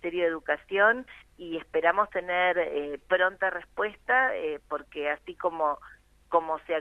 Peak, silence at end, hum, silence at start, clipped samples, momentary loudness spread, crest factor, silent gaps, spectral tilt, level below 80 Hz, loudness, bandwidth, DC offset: -8 dBFS; 0 s; none; 0.05 s; under 0.1%; 11 LU; 20 dB; none; -5.5 dB/octave; -62 dBFS; -28 LUFS; 9.8 kHz; under 0.1%